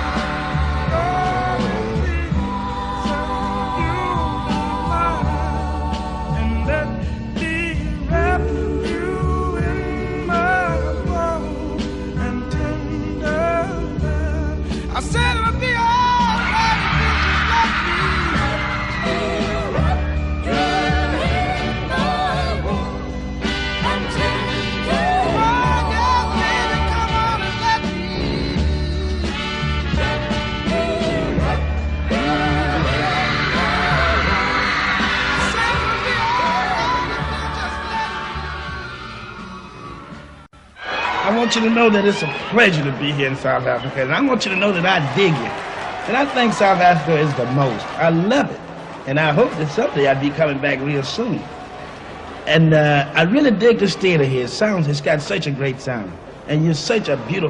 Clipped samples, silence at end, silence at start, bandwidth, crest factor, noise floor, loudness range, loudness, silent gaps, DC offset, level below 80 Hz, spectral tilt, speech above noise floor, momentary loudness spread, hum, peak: under 0.1%; 0 s; 0 s; 11 kHz; 18 dB; -42 dBFS; 5 LU; -19 LUFS; none; under 0.1%; -28 dBFS; -5.5 dB/octave; 26 dB; 9 LU; none; -2 dBFS